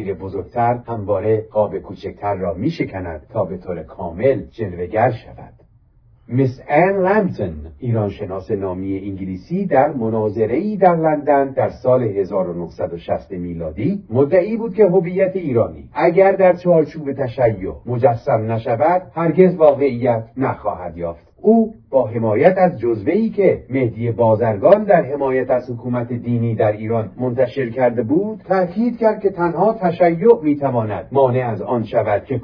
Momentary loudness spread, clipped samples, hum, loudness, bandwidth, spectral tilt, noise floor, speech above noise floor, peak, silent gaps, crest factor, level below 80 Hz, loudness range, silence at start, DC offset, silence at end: 11 LU; under 0.1%; none; -18 LUFS; 5.4 kHz; -10.5 dB/octave; -51 dBFS; 34 dB; 0 dBFS; none; 18 dB; -48 dBFS; 5 LU; 0 s; under 0.1%; 0 s